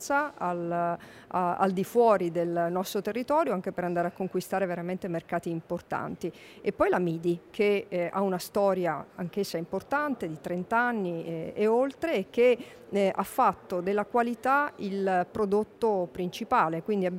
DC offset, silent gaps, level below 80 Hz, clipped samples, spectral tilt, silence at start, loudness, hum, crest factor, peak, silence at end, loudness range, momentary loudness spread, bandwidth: under 0.1%; none; -64 dBFS; under 0.1%; -6 dB/octave; 0 s; -29 LUFS; none; 18 dB; -10 dBFS; 0 s; 4 LU; 8 LU; 16 kHz